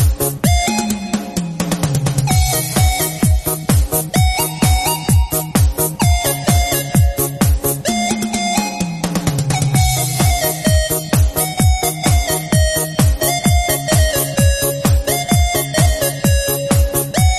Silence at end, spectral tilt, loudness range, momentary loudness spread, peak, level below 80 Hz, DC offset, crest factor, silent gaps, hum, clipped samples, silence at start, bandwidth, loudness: 0 s; -4.5 dB/octave; 2 LU; 3 LU; 0 dBFS; -20 dBFS; under 0.1%; 14 dB; none; none; under 0.1%; 0 s; 13.5 kHz; -15 LUFS